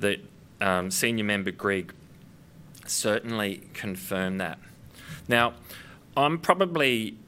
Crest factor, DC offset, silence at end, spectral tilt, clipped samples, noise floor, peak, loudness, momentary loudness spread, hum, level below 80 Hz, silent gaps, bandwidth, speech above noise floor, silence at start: 26 dB; under 0.1%; 0.1 s; -3.5 dB/octave; under 0.1%; -51 dBFS; -4 dBFS; -27 LUFS; 20 LU; none; -62 dBFS; none; 16 kHz; 24 dB; 0 s